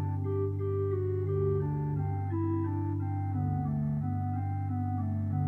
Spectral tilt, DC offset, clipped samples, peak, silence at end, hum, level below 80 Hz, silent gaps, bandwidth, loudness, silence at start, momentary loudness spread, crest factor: -12.5 dB/octave; under 0.1%; under 0.1%; -20 dBFS; 0 s; 50 Hz at -55 dBFS; -54 dBFS; none; 2.5 kHz; -32 LUFS; 0 s; 3 LU; 12 dB